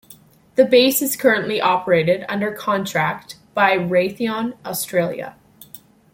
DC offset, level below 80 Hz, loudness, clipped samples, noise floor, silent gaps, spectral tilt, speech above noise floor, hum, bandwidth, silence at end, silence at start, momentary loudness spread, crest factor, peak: under 0.1%; -62 dBFS; -19 LUFS; under 0.1%; -48 dBFS; none; -4 dB/octave; 30 dB; none; 16.5 kHz; 0.35 s; 0.1 s; 11 LU; 18 dB; -2 dBFS